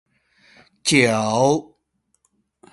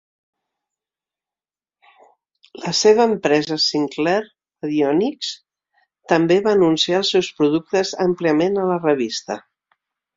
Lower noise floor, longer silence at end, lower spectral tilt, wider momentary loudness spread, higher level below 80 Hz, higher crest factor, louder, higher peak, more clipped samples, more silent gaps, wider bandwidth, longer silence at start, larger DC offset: second, -70 dBFS vs under -90 dBFS; first, 1.1 s vs 0.8 s; about the same, -4 dB/octave vs -4.5 dB/octave; second, 9 LU vs 12 LU; about the same, -62 dBFS vs -62 dBFS; about the same, 22 dB vs 18 dB; about the same, -18 LUFS vs -18 LUFS; about the same, 0 dBFS vs -2 dBFS; neither; neither; first, 11.5 kHz vs 7.8 kHz; second, 0.85 s vs 2.55 s; neither